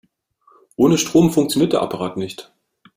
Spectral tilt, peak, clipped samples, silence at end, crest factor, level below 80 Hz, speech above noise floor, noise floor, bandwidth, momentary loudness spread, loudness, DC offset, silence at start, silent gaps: -5.5 dB/octave; -2 dBFS; under 0.1%; 0.55 s; 16 dB; -52 dBFS; 41 dB; -58 dBFS; 16 kHz; 16 LU; -17 LUFS; under 0.1%; 0.8 s; none